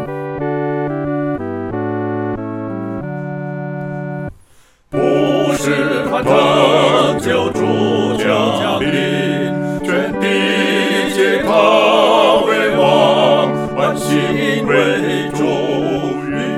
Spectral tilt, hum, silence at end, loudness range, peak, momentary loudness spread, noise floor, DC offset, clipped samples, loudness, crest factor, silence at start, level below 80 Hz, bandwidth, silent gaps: -5.5 dB/octave; none; 0 s; 9 LU; 0 dBFS; 13 LU; -48 dBFS; under 0.1%; under 0.1%; -15 LUFS; 14 dB; 0 s; -46 dBFS; 16 kHz; none